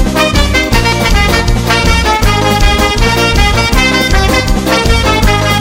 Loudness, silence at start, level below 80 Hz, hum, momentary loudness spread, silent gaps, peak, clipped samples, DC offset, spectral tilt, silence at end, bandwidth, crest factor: -9 LUFS; 0 s; -14 dBFS; none; 2 LU; none; 0 dBFS; 0.5%; under 0.1%; -4 dB/octave; 0 s; 16.5 kHz; 8 dB